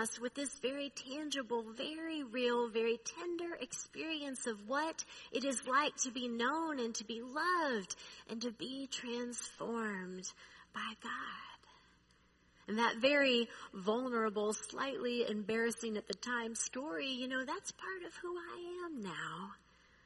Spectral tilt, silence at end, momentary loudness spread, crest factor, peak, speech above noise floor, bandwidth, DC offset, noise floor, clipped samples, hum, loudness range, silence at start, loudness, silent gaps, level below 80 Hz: -2.5 dB/octave; 0.5 s; 11 LU; 22 dB; -18 dBFS; 31 dB; 11.5 kHz; under 0.1%; -70 dBFS; under 0.1%; none; 7 LU; 0 s; -39 LUFS; none; -76 dBFS